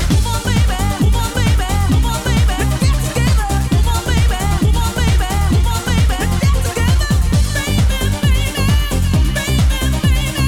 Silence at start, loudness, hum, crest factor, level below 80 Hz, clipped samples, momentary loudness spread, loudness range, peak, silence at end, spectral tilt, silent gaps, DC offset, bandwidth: 0 s; -16 LUFS; none; 8 dB; -16 dBFS; under 0.1%; 1 LU; 0 LU; -4 dBFS; 0 s; -5 dB/octave; none; under 0.1%; 18 kHz